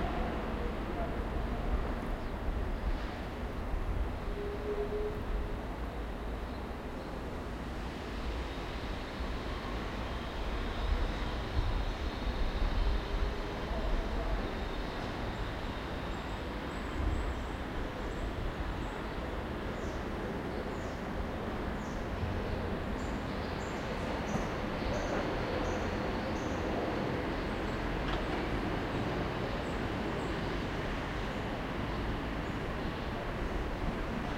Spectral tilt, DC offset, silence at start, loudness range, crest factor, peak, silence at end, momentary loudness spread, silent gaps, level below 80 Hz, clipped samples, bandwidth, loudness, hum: -6.5 dB/octave; under 0.1%; 0 s; 4 LU; 16 dB; -18 dBFS; 0 s; 5 LU; none; -38 dBFS; under 0.1%; 16 kHz; -37 LUFS; none